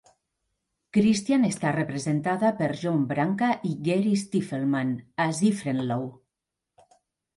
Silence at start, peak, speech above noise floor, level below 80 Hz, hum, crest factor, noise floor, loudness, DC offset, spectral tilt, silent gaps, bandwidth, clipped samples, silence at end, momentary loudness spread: 0.95 s; -12 dBFS; 61 dB; -66 dBFS; none; 16 dB; -86 dBFS; -26 LUFS; under 0.1%; -6 dB/octave; none; 11.5 kHz; under 0.1%; 1.25 s; 6 LU